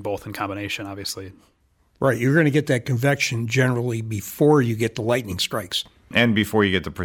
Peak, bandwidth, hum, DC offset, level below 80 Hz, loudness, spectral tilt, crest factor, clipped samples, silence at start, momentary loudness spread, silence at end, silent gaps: -4 dBFS; 17.5 kHz; none; under 0.1%; -54 dBFS; -22 LUFS; -5.5 dB/octave; 18 dB; under 0.1%; 0 s; 11 LU; 0 s; none